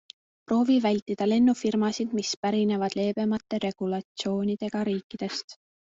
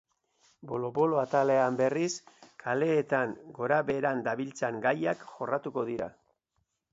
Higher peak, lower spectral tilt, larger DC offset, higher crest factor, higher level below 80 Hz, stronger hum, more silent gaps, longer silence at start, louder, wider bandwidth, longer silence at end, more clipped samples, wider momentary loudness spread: about the same, -12 dBFS vs -12 dBFS; about the same, -5.5 dB/octave vs -5.5 dB/octave; neither; second, 14 dB vs 20 dB; about the same, -66 dBFS vs -70 dBFS; neither; first, 1.02-1.06 s, 2.37-2.43 s, 4.05-4.15 s, 5.03-5.10 s, 5.44-5.48 s vs none; second, 0.5 s vs 0.65 s; first, -27 LUFS vs -30 LUFS; about the same, 7.8 kHz vs 8 kHz; second, 0.35 s vs 0.85 s; neither; about the same, 9 LU vs 10 LU